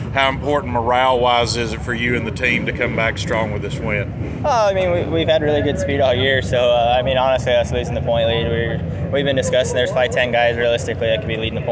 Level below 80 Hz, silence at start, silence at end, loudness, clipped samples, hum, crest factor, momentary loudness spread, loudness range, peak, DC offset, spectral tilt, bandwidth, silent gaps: -34 dBFS; 0 s; 0 s; -18 LUFS; under 0.1%; none; 16 dB; 6 LU; 2 LU; -2 dBFS; under 0.1%; -5 dB/octave; 8 kHz; none